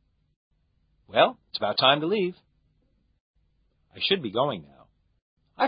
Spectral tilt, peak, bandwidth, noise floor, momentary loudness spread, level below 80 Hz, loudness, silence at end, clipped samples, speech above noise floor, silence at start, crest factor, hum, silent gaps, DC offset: -8.5 dB/octave; -4 dBFS; 5.2 kHz; -69 dBFS; 10 LU; -68 dBFS; -24 LUFS; 0 s; under 0.1%; 44 dB; 1.1 s; 24 dB; none; 3.20-3.34 s, 5.22-5.37 s; under 0.1%